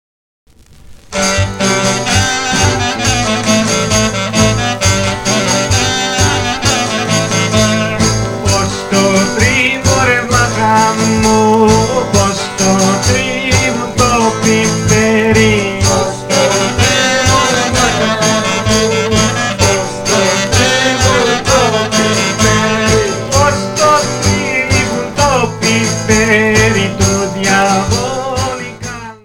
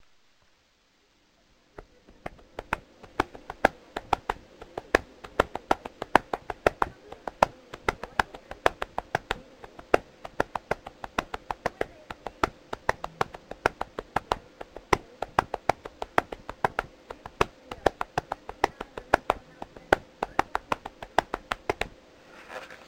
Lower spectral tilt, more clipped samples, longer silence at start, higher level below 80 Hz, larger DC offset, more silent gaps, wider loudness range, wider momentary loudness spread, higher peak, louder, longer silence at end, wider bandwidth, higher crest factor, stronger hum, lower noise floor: about the same, -3.5 dB/octave vs -4.5 dB/octave; neither; second, 0.85 s vs 1.8 s; first, -30 dBFS vs -48 dBFS; neither; neither; about the same, 2 LU vs 4 LU; second, 4 LU vs 15 LU; about the same, 0 dBFS vs 0 dBFS; first, -11 LUFS vs -30 LUFS; about the same, 0.1 s vs 0.1 s; about the same, 17 kHz vs 16.5 kHz; second, 12 dB vs 32 dB; neither; second, -36 dBFS vs -66 dBFS